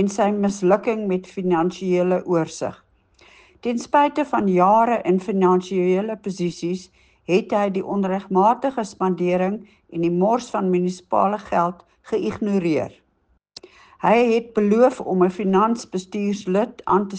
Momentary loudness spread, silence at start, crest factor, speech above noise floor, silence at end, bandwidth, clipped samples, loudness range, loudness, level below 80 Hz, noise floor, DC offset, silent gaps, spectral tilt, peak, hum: 9 LU; 0 s; 16 dB; 45 dB; 0 s; 9.2 kHz; under 0.1%; 3 LU; -21 LUFS; -60 dBFS; -65 dBFS; under 0.1%; none; -7 dB/octave; -4 dBFS; none